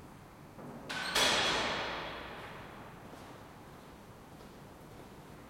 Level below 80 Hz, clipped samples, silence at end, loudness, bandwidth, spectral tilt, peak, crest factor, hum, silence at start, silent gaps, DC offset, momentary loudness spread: -60 dBFS; under 0.1%; 0 s; -32 LUFS; 16.5 kHz; -2 dB/octave; -16 dBFS; 22 dB; none; 0 s; none; under 0.1%; 24 LU